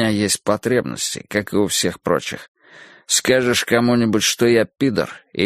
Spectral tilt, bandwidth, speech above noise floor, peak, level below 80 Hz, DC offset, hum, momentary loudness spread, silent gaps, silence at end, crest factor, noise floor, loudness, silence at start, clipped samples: -3.5 dB/octave; 15.5 kHz; 27 dB; 0 dBFS; -54 dBFS; under 0.1%; none; 8 LU; 2.48-2.55 s; 0 s; 18 dB; -45 dBFS; -18 LUFS; 0 s; under 0.1%